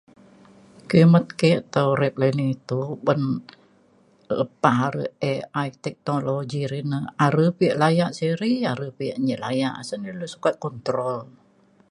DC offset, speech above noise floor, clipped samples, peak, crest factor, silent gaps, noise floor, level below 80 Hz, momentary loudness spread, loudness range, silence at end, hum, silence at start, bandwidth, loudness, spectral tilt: under 0.1%; 36 dB; under 0.1%; -2 dBFS; 20 dB; none; -58 dBFS; -64 dBFS; 11 LU; 5 LU; 0.65 s; none; 0.9 s; 11 kHz; -23 LUFS; -7 dB/octave